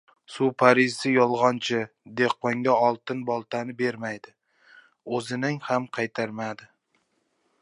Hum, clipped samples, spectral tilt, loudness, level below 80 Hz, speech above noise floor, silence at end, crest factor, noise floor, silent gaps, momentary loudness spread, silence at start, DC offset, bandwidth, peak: none; under 0.1%; -5.5 dB/octave; -25 LUFS; -76 dBFS; 47 dB; 1 s; 24 dB; -72 dBFS; none; 14 LU; 0.3 s; under 0.1%; 11.5 kHz; -2 dBFS